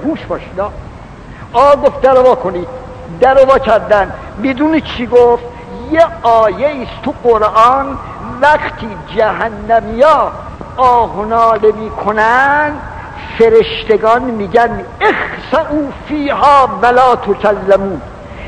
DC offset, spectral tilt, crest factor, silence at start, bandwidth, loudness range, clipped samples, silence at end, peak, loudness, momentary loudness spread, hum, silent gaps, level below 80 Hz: under 0.1%; -6 dB/octave; 12 dB; 0 s; 11 kHz; 2 LU; 1%; 0 s; 0 dBFS; -11 LUFS; 16 LU; none; none; -34 dBFS